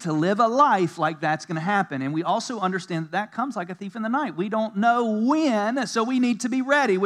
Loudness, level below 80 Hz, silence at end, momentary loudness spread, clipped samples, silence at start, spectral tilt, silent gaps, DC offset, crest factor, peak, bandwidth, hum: -23 LUFS; -88 dBFS; 0 s; 9 LU; under 0.1%; 0 s; -5.5 dB/octave; none; under 0.1%; 18 dB; -6 dBFS; 12 kHz; none